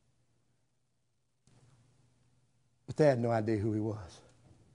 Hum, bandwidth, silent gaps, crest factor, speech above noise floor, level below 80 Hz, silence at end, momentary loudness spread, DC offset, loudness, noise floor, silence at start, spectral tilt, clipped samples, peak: none; 11 kHz; none; 24 dB; 50 dB; -70 dBFS; 0.6 s; 17 LU; under 0.1%; -31 LUFS; -81 dBFS; 2.9 s; -8 dB/octave; under 0.1%; -12 dBFS